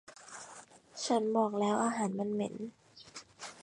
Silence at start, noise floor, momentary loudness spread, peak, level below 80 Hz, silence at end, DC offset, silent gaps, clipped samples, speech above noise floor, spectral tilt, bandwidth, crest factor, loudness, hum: 0.1 s; -55 dBFS; 19 LU; -16 dBFS; -80 dBFS; 0 s; under 0.1%; none; under 0.1%; 23 dB; -4.5 dB/octave; 11 kHz; 18 dB; -33 LUFS; none